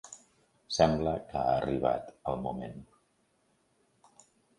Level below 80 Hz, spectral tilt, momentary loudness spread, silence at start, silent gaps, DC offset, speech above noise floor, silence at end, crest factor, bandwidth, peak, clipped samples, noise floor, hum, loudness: -54 dBFS; -5.5 dB/octave; 21 LU; 0.05 s; none; under 0.1%; 42 dB; 1.75 s; 24 dB; 11.5 kHz; -10 dBFS; under 0.1%; -72 dBFS; none; -31 LUFS